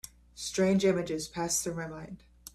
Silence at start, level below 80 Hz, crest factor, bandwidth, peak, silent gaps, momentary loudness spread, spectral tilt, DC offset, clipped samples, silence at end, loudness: 0.35 s; -58 dBFS; 16 dB; 15 kHz; -14 dBFS; none; 21 LU; -4.5 dB/octave; under 0.1%; under 0.1%; 0.05 s; -30 LUFS